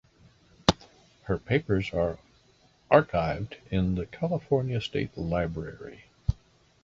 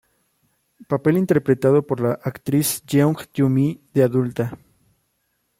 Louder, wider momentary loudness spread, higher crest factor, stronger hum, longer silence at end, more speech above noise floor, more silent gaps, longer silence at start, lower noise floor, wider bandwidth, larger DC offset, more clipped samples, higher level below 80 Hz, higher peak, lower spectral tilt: second, -28 LUFS vs -20 LUFS; first, 17 LU vs 8 LU; first, 26 dB vs 18 dB; neither; second, 0.5 s vs 1.05 s; second, 35 dB vs 51 dB; neither; second, 0.7 s vs 0.9 s; second, -62 dBFS vs -70 dBFS; second, 8 kHz vs 16.5 kHz; neither; neither; first, -44 dBFS vs -60 dBFS; about the same, -2 dBFS vs -4 dBFS; about the same, -6.5 dB/octave vs -6.5 dB/octave